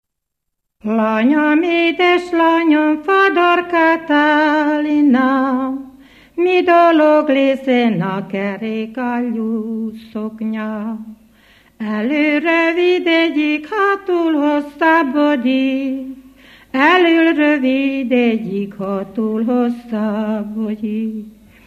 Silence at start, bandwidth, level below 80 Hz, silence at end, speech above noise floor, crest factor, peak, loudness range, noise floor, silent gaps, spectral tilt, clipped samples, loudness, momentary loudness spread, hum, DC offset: 0.85 s; 7.8 kHz; -58 dBFS; 0.35 s; 63 dB; 16 dB; 0 dBFS; 7 LU; -78 dBFS; none; -6.5 dB/octave; under 0.1%; -15 LUFS; 11 LU; none; under 0.1%